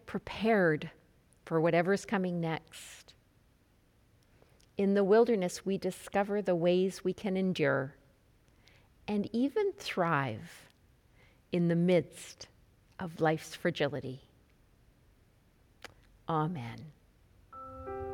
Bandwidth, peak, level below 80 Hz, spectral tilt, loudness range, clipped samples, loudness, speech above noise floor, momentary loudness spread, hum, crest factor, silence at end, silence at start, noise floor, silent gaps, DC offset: 16 kHz; -16 dBFS; -64 dBFS; -6.5 dB/octave; 9 LU; under 0.1%; -31 LUFS; 36 dB; 21 LU; none; 18 dB; 0 s; 0.05 s; -67 dBFS; none; under 0.1%